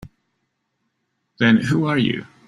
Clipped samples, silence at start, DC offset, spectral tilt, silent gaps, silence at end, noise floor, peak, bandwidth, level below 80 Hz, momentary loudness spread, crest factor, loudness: under 0.1%; 1.4 s; under 0.1%; -6.5 dB/octave; none; 0.2 s; -73 dBFS; -2 dBFS; 10.5 kHz; -54 dBFS; 5 LU; 20 dB; -18 LUFS